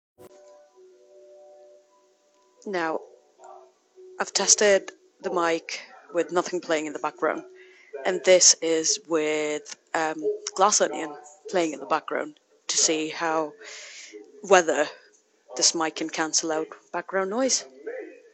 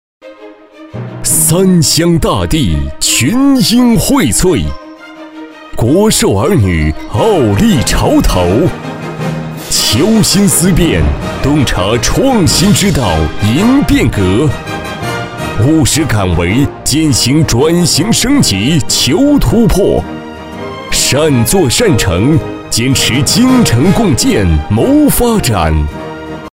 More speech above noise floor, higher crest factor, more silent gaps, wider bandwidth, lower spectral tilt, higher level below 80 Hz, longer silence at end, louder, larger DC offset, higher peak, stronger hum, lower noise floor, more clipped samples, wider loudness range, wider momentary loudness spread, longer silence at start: first, 38 dB vs 25 dB; first, 24 dB vs 10 dB; neither; second, 9 kHz vs 16.5 kHz; second, -1 dB/octave vs -4.5 dB/octave; second, -74 dBFS vs -22 dBFS; first, 0.2 s vs 0.05 s; second, -24 LUFS vs -10 LUFS; neither; about the same, -2 dBFS vs 0 dBFS; neither; first, -63 dBFS vs -34 dBFS; neither; first, 8 LU vs 2 LU; first, 19 LU vs 12 LU; about the same, 0.2 s vs 0.25 s